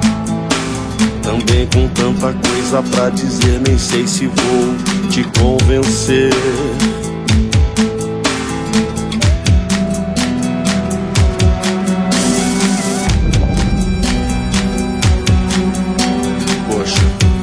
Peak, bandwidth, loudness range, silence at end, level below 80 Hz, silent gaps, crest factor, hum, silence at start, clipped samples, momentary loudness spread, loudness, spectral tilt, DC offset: 0 dBFS; 11 kHz; 2 LU; 0 s; -20 dBFS; none; 14 dB; none; 0 s; under 0.1%; 4 LU; -14 LUFS; -5 dB/octave; under 0.1%